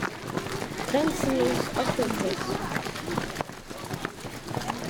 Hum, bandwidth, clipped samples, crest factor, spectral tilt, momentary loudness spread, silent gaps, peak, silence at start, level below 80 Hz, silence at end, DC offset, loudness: none; over 20 kHz; under 0.1%; 18 dB; -4.5 dB/octave; 10 LU; none; -12 dBFS; 0 s; -48 dBFS; 0 s; under 0.1%; -29 LUFS